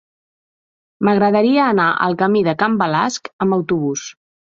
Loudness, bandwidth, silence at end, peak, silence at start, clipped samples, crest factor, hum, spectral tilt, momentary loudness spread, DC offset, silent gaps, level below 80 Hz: -16 LUFS; 7.6 kHz; 0.4 s; -2 dBFS; 1 s; under 0.1%; 16 dB; none; -5.5 dB/octave; 8 LU; under 0.1%; 3.33-3.39 s; -60 dBFS